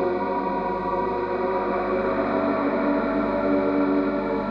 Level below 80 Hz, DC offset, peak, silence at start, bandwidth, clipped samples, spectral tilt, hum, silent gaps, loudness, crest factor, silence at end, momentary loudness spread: -48 dBFS; under 0.1%; -10 dBFS; 0 s; 5.6 kHz; under 0.1%; -9 dB/octave; 50 Hz at -40 dBFS; none; -24 LUFS; 14 dB; 0 s; 3 LU